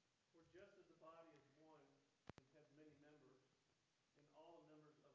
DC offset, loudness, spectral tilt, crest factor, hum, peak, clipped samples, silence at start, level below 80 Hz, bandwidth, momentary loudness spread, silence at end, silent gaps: under 0.1%; -68 LUFS; -5 dB/octave; 32 dB; none; -38 dBFS; under 0.1%; 0 s; under -90 dBFS; 7.2 kHz; 2 LU; 0 s; none